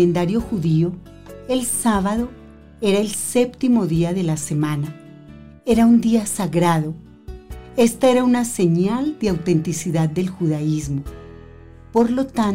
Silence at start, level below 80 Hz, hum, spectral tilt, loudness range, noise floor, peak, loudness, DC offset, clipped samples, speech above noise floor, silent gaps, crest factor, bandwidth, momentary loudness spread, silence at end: 0 s; -42 dBFS; none; -6 dB/octave; 3 LU; -42 dBFS; -6 dBFS; -19 LUFS; 0.2%; under 0.1%; 23 dB; none; 14 dB; 16 kHz; 15 LU; 0 s